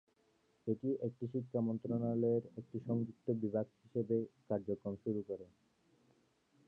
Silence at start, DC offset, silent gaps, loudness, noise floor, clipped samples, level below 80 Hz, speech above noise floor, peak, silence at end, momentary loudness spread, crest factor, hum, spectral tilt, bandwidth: 0.65 s; under 0.1%; none; -40 LUFS; -75 dBFS; under 0.1%; -76 dBFS; 37 dB; -24 dBFS; 1.2 s; 7 LU; 16 dB; none; -12 dB/octave; 3.5 kHz